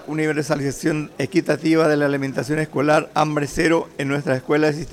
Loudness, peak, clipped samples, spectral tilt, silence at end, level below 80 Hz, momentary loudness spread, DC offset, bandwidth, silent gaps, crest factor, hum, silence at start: -20 LUFS; -6 dBFS; under 0.1%; -6 dB/octave; 0 s; -48 dBFS; 6 LU; under 0.1%; 15 kHz; none; 14 dB; none; 0 s